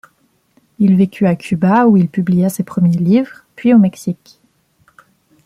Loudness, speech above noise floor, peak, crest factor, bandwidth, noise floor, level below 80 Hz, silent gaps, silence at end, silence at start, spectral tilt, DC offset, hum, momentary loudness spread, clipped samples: -14 LUFS; 46 dB; -2 dBFS; 14 dB; 14.5 kHz; -59 dBFS; -54 dBFS; none; 1.3 s; 0.8 s; -8 dB/octave; under 0.1%; none; 10 LU; under 0.1%